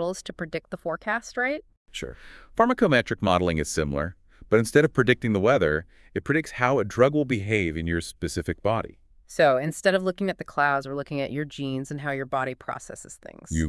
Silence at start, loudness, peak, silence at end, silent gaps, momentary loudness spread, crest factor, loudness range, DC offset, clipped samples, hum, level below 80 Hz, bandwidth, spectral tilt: 0 s; -25 LUFS; -6 dBFS; 0 s; 1.77-1.86 s; 14 LU; 20 dB; 4 LU; under 0.1%; under 0.1%; none; -48 dBFS; 12 kHz; -5.5 dB/octave